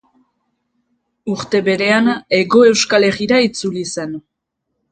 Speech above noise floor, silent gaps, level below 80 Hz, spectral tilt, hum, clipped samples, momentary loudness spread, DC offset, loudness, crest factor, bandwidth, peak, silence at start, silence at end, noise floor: 60 dB; none; -56 dBFS; -4 dB/octave; none; under 0.1%; 14 LU; under 0.1%; -14 LUFS; 16 dB; 9.4 kHz; 0 dBFS; 1.25 s; 0.75 s; -75 dBFS